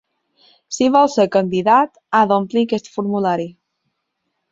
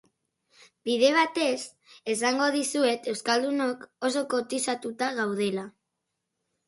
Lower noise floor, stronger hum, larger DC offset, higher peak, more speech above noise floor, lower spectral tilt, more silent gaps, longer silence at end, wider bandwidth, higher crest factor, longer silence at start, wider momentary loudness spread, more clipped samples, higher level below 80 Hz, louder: second, -74 dBFS vs -82 dBFS; neither; neither; first, 0 dBFS vs -8 dBFS; about the same, 58 dB vs 56 dB; first, -5.5 dB/octave vs -3 dB/octave; neither; about the same, 1 s vs 0.95 s; second, 7.8 kHz vs 11.5 kHz; about the same, 18 dB vs 20 dB; second, 0.7 s vs 0.85 s; second, 8 LU vs 11 LU; neither; first, -62 dBFS vs -78 dBFS; first, -17 LUFS vs -27 LUFS